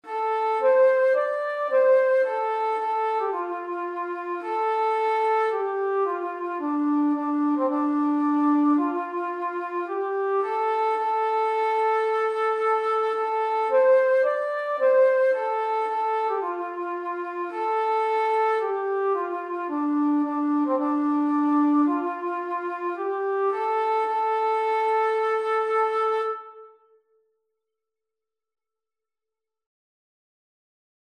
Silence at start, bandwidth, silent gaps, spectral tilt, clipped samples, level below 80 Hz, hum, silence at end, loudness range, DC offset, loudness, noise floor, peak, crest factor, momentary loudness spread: 0.05 s; 8.8 kHz; none; -4.5 dB/octave; under 0.1%; under -90 dBFS; none; 4.35 s; 4 LU; under 0.1%; -24 LUFS; under -90 dBFS; -10 dBFS; 14 dB; 10 LU